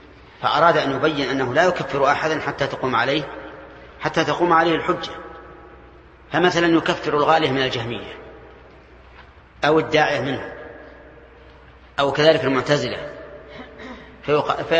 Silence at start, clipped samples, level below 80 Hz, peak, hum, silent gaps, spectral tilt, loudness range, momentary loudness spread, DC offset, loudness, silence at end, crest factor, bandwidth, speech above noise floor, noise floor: 0.4 s; under 0.1%; -50 dBFS; 0 dBFS; none; none; -5 dB/octave; 4 LU; 21 LU; under 0.1%; -20 LUFS; 0 s; 22 dB; 8.6 kHz; 27 dB; -46 dBFS